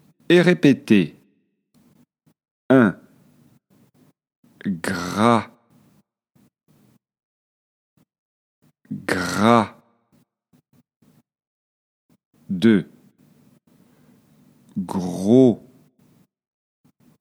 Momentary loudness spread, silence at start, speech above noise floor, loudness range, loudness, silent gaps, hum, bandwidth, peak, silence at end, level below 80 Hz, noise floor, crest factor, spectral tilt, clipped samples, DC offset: 16 LU; 0.3 s; 49 dB; 5 LU; -19 LUFS; 2.51-2.69 s, 4.36-4.43 s, 7.23-7.97 s, 8.19-8.62 s, 10.96-11.00 s, 11.47-12.09 s, 12.25-12.31 s; none; 15 kHz; 0 dBFS; 1.65 s; -66 dBFS; -66 dBFS; 22 dB; -6.5 dB/octave; under 0.1%; under 0.1%